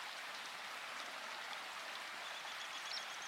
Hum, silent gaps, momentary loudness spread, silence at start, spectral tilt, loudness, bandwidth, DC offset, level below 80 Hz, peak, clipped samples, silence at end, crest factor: none; none; 3 LU; 0 s; 1 dB/octave; -45 LUFS; 16 kHz; under 0.1%; under -90 dBFS; -30 dBFS; under 0.1%; 0 s; 18 dB